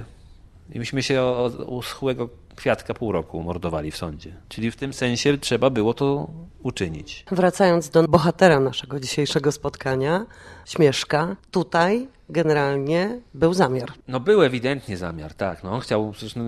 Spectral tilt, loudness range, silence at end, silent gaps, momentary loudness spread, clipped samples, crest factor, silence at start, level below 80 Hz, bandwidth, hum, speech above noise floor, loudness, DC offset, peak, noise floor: -5.5 dB/octave; 6 LU; 0 s; none; 13 LU; under 0.1%; 22 dB; 0 s; -48 dBFS; 13.5 kHz; none; 25 dB; -22 LUFS; under 0.1%; 0 dBFS; -47 dBFS